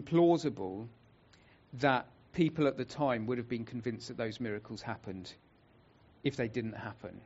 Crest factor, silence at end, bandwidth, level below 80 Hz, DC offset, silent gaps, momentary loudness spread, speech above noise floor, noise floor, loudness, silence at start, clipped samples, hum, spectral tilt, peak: 22 dB; 0 s; 8 kHz; -66 dBFS; under 0.1%; none; 15 LU; 30 dB; -64 dBFS; -35 LUFS; 0 s; under 0.1%; none; -5.5 dB/octave; -14 dBFS